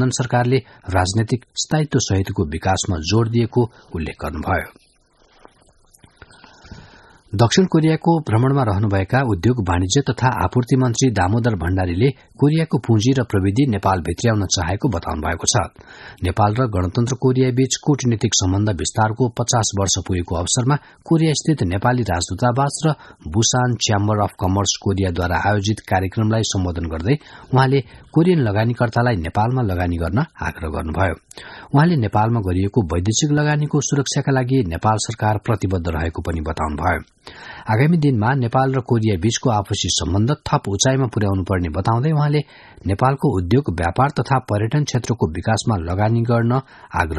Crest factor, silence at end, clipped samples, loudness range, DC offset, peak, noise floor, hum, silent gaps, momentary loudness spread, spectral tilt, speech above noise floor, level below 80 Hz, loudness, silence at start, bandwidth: 18 dB; 0 s; under 0.1%; 3 LU; under 0.1%; 0 dBFS; -56 dBFS; none; none; 7 LU; -5.5 dB/octave; 38 dB; -38 dBFS; -19 LUFS; 0 s; 12 kHz